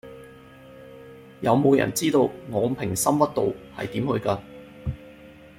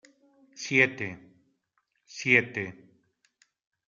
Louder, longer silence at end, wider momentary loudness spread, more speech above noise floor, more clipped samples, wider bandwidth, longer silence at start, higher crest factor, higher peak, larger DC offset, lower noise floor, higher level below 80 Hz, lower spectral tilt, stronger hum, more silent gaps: about the same, -24 LUFS vs -25 LUFS; second, 0.25 s vs 1.2 s; first, 24 LU vs 19 LU; second, 24 dB vs 50 dB; neither; first, 16.5 kHz vs 7.6 kHz; second, 0.05 s vs 0.55 s; second, 20 dB vs 26 dB; about the same, -4 dBFS vs -6 dBFS; neither; second, -47 dBFS vs -76 dBFS; first, -52 dBFS vs -70 dBFS; about the same, -5.5 dB/octave vs -4.5 dB/octave; neither; neither